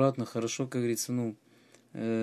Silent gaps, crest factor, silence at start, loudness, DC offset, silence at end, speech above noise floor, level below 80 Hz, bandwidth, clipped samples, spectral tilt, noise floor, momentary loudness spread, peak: none; 20 dB; 0 s; -32 LUFS; under 0.1%; 0 s; 30 dB; -78 dBFS; 14.5 kHz; under 0.1%; -5.5 dB/octave; -61 dBFS; 11 LU; -12 dBFS